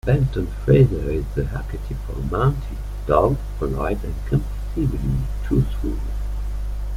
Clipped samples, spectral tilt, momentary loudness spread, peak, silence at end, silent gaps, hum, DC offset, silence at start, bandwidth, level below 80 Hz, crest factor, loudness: under 0.1%; -9 dB/octave; 11 LU; -2 dBFS; 0 s; none; 50 Hz at -25 dBFS; under 0.1%; 0.05 s; 15 kHz; -26 dBFS; 18 dB; -23 LUFS